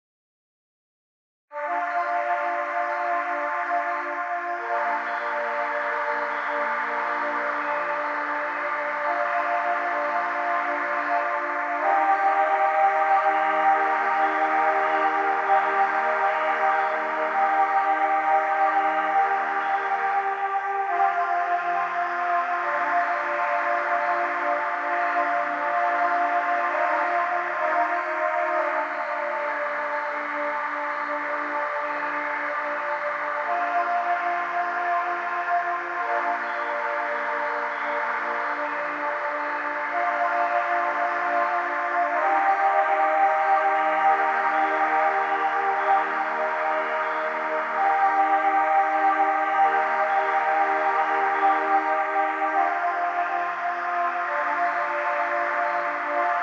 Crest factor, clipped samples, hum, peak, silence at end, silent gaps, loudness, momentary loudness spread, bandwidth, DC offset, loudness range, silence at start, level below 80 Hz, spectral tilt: 16 dB; under 0.1%; none; -8 dBFS; 0 s; none; -24 LUFS; 6 LU; 7.6 kHz; under 0.1%; 5 LU; 1.5 s; under -90 dBFS; -3 dB/octave